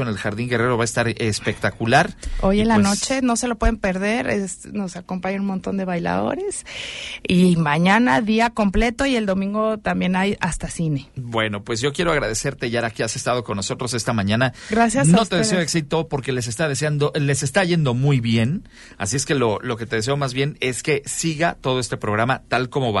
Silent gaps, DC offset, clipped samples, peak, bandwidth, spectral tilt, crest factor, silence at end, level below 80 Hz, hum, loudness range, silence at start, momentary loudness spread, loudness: none; under 0.1%; under 0.1%; -2 dBFS; 11.5 kHz; -5 dB/octave; 18 dB; 0 s; -36 dBFS; none; 4 LU; 0 s; 8 LU; -21 LUFS